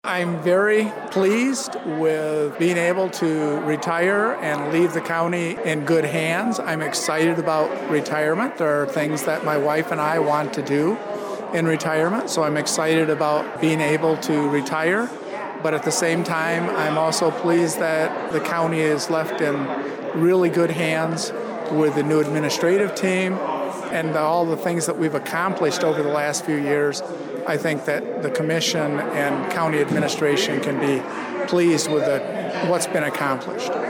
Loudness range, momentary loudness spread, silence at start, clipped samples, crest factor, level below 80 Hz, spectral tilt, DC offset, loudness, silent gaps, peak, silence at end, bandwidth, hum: 1 LU; 5 LU; 0.05 s; under 0.1%; 12 dB; -70 dBFS; -4.5 dB/octave; under 0.1%; -21 LUFS; none; -8 dBFS; 0 s; 19.5 kHz; none